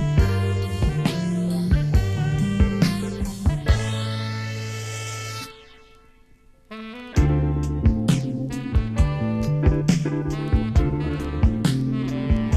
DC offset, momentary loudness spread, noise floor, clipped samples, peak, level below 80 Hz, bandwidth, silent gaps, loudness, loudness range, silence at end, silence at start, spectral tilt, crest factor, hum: under 0.1%; 9 LU; -52 dBFS; under 0.1%; -4 dBFS; -28 dBFS; 14 kHz; none; -23 LUFS; 6 LU; 0 s; 0 s; -6.5 dB/octave; 16 dB; none